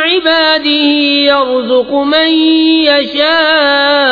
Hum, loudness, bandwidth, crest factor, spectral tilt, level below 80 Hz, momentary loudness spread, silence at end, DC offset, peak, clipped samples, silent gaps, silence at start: none; -9 LUFS; 5 kHz; 10 dB; -4 dB/octave; -50 dBFS; 3 LU; 0 s; under 0.1%; 0 dBFS; under 0.1%; none; 0 s